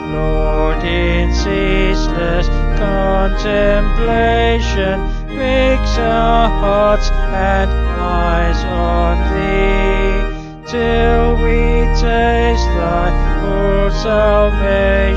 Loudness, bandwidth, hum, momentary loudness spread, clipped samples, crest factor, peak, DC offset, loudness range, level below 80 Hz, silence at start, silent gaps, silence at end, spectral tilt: -15 LUFS; 7.4 kHz; none; 5 LU; under 0.1%; 12 dB; 0 dBFS; under 0.1%; 1 LU; -16 dBFS; 0 s; none; 0 s; -6.5 dB/octave